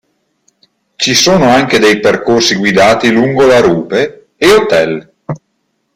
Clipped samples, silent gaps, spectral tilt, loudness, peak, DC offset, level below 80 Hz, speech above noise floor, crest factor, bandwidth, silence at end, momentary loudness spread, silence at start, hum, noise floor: under 0.1%; none; -4 dB/octave; -9 LUFS; 0 dBFS; under 0.1%; -42 dBFS; 55 dB; 10 dB; 16.5 kHz; 0.6 s; 13 LU; 1 s; none; -64 dBFS